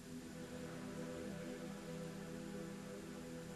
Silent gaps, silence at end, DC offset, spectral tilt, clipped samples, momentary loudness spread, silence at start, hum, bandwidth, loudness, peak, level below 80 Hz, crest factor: none; 0 s; under 0.1%; -5.5 dB/octave; under 0.1%; 3 LU; 0 s; none; 13 kHz; -49 LUFS; -36 dBFS; -68 dBFS; 14 dB